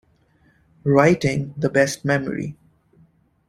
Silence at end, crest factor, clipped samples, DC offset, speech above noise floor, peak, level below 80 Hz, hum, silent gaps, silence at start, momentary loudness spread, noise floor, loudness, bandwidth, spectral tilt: 0.95 s; 20 dB; under 0.1%; under 0.1%; 40 dB; -2 dBFS; -52 dBFS; none; none; 0.85 s; 13 LU; -59 dBFS; -20 LUFS; 14.5 kHz; -6 dB/octave